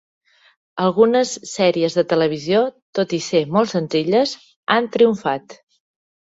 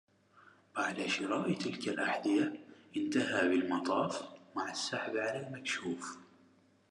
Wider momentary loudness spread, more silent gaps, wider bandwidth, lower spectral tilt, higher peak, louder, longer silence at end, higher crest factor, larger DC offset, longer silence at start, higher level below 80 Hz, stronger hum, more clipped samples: second, 8 LU vs 12 LU; first, 2.82-2.93 s, 4.56-4.63 s vs none; second, 8 kHz vs 11.5 kHz; about the same, -5 dB/octave vs -4 dB/octave; first, -2 dBFS vs -18 dBFS; first, -18 LUFS vs -35 LUFS; about the same, 0.75 s vs 0.65 s; about the same, 16 dB vs 18 dB; neither; about the same, 0.75 s vs 0.75 s; first, -64 dBFS vs -88 dBFS; neither; neither